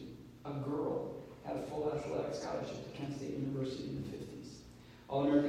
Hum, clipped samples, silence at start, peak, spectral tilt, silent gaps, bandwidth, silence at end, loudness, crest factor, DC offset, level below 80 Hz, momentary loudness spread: none; under 0.1%; 0 s; -18 dBFS; -7 dB/octave; none; 14 kHz; 0 s; -40 LUFS; 20 dB; under 0.1%; -64 dBFS; 13 LU